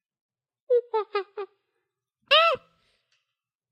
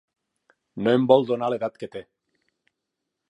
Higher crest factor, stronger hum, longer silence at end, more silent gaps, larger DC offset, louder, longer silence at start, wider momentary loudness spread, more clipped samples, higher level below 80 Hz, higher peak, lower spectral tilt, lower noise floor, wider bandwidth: about the same, 20 dB vs 22 dB; neither; second, 1.15 s vs 1.3 s; neither; neither; about the same, -23 LUFS vs -22 LUFS; about the same, 0.7 s vs 0.75 s; about the same, 20 LU vs 21 LU; neither; second, -78 dBFS vs -70 dBFS; second, -8 dBFS vs -4 dBFS; second, -2 dB/octave vs -8 dB/octave; about the same, -85 dBFS vs -82 dBFS; first, 13 kHz vs 8.2 kHz